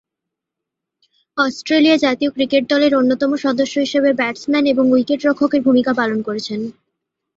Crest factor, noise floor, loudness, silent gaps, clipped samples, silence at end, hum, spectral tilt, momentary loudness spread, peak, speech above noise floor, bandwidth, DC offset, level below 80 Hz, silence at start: 14 dB; -82 dBFS; -16 LUFS; none; under 0.1%; 0.65 s; none; -4.5 dB/octave; 9 LU; -2 dBFS; 66 dB; 7.8 kHz; under 0.1%; -60 dBFS; 1.35 s